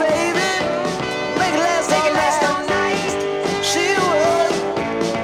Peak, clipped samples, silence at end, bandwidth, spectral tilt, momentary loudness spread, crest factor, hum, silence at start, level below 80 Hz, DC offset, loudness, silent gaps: -4 dBFS; under 0.1%; 0 s; 16.5 kHz; -3.5 dB/octave; 5 LU; 14 dB; none; 0 s; -50 dBFS; under 0.1%; -18 LUFS; none